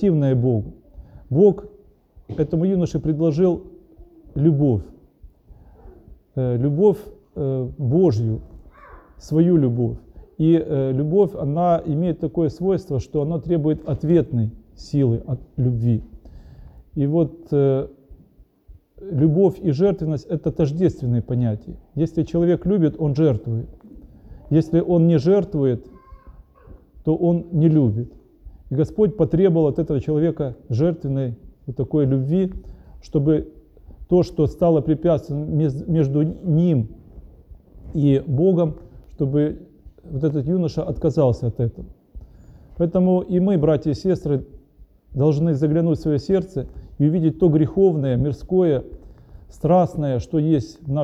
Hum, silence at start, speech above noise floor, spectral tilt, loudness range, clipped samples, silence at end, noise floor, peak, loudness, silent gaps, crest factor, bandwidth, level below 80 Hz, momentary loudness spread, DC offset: none; 0 s; 33 dB; -10 dB/octave; 3 LU; under 0.1%; 0 s; -52 dBFS; -4 dBFS; -20 LUFS; none; 16 dB; 7.6 kHz; -42 dBFS; 11 LU; under 0.1%